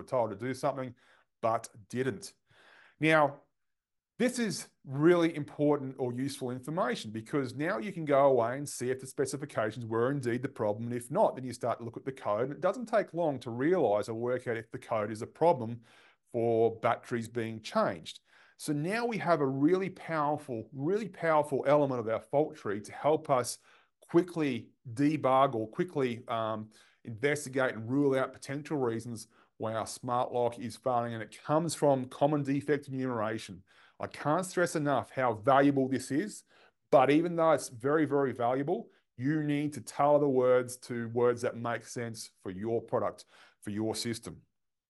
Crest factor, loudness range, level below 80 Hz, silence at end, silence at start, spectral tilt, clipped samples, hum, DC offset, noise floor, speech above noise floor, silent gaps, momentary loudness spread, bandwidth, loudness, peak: 20 dB; 4 LU; -76 dBFS; 0.5 s; 0 s; -6 dB/octave; under 0.1%; none; under 0.1%; -87 dBFS; 56 dB; none; 13 LU; 12 kHz; -31 LUFS; -10 dBFS